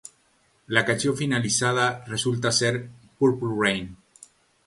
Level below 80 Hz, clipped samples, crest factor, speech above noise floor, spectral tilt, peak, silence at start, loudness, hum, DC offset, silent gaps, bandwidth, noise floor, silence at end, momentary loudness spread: -58 dBFS; under 0.1%; 24 dB; 40 dB; -4 dB/octave; -2 dBFS; 0.7 s; -24 LUFS; none; under 0.1%; none; 11.5 kHz; -64 dBFS; 0.7 s; 8 LU